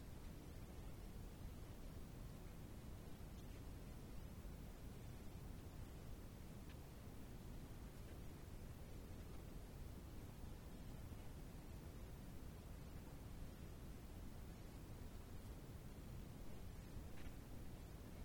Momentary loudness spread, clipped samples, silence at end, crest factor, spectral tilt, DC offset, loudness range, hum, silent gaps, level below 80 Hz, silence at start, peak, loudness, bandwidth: 1 LU; under 0.1%; 0 s; 14 dB; -6 dB/octave; under 0.1%; 0 LU; none; none; -58 dBFS; 0 s; -40 dBFS; -57 LUFS; 19 kHz